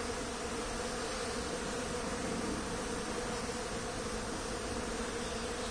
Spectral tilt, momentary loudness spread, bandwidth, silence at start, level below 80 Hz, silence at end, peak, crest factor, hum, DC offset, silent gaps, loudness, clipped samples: -3.5 dB/octave; 1 LU; 10.5 kHz; 0 s; -48 dBFS; 0 s; -24 dBFS; 14 dB; none; under 0.1%; none; -38 LUFS; under 0.1%